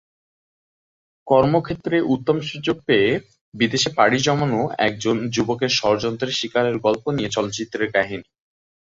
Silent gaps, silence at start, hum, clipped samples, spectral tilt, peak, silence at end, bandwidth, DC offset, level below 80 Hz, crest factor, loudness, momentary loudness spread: 3.41-3.52 s; 1.25 s; none; under 0.1%; -4.5 dB/octave; -2 dBFS; 0.7 s; 7.8 kHz; under 0.1%; -54 dBFS; 20 dB; -20 LUFS; 7 LU